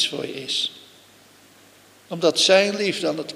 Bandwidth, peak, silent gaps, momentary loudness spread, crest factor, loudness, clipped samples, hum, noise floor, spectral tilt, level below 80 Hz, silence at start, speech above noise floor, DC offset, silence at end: 15.5 kHz; -2 dBFS; none; 13 LU; 20 dB; -20 LUFS; under 0.1%; none; -52 dBFS; -2.5 dB/octave; -76 dBFS; 0 s; 30 dB; under 0.1%; 0 s